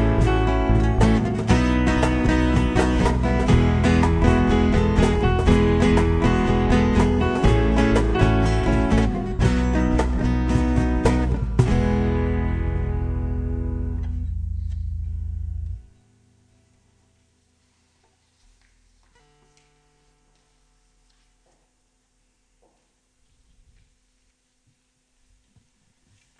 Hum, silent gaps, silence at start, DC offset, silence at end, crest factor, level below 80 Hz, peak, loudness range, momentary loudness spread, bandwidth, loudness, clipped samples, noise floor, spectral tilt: none; none; 0 s; under 0.1%; 10.6 s; 18 dB; -26 dBFS; -2 dBFS; 13 LU; 11 LU; 10.5 kHz; -21 LUFS; under 0.1%; -67 dBFS; -7 dB/octave